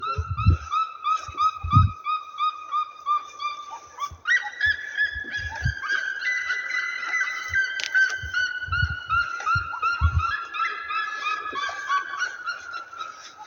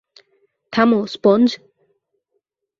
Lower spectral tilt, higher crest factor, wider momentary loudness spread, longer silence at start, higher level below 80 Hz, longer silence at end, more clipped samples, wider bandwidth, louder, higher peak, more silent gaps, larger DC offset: second, -4 dB/octave vs -6.5 dB/octave; about the same, 22 dB vs 18 dB; about the same, 10 LU vs 9 LU; second, 0 s vs 0.7 s; first, -38 dBFS vs -64 dBFS; second, 0 s vs 1.25 s; neither; first, 16.5 kHz vs 7.2 kHz; second, -25 LUFS vs -17 LUFS; about the same, -4 dBFS vs -2 dBFS; neither; neither